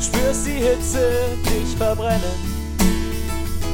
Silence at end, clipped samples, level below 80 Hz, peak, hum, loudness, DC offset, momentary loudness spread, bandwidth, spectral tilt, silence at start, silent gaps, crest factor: 0 s; under 0.1%; -26 dBFS; -4 dBFS; none; -21 LUFS; under 0.1%; 7 LU; 17 kHz; -4.5 dB/octave; 0 s; none; 16 dB